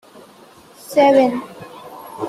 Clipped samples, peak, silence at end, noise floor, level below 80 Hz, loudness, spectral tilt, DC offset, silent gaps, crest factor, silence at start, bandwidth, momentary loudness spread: under 0.1%; -2 dBFS; 0 s; -45 dBFS; -64 dBFS; -15 LUFS; -5 dB/octave; under 0.1%; none; 18 dB; 0.9 s; 14 kHz; 24 LU